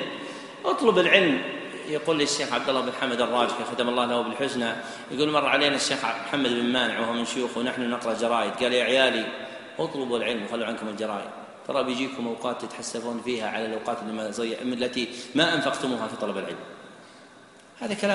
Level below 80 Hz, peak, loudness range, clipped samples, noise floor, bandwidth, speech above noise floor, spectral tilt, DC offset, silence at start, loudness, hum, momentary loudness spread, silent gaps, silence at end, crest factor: -68 dBFS; -2 dBFS; 6 LU; under 0.1%; -51 dBFS; 11.5 kHz; 25 dB; -3.5 dB/octave; under 0.1%; 0 s; -26 LUFS; none; 12 LU; none; 0 s; 24 dB